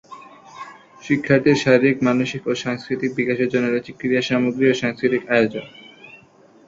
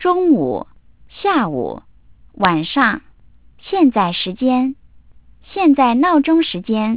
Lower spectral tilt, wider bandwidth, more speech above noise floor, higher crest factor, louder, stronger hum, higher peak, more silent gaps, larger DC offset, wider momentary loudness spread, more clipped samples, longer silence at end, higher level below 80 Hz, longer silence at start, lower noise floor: second, -6 dB/octave vs -10 dB/octave; first, 7.8 kHz vs 4 kHz; about the same, 31 dB vs 33 dB; about the same, 18 dB vs 16 dB; second, -19 LUFS vs -16 LUFS; neither; about the same, -2 dBFS vs 0 dBFS; neither; second, under 0.1% vs 0.4%; first, 21 LU vs 13 LU; neither; first, 0.55 s vs 0 s; second, -60 dBFS vs -50 dBFS; about the same, 0.1 s vs 0 s; about the same, -50 dBFS vs -49 dBFS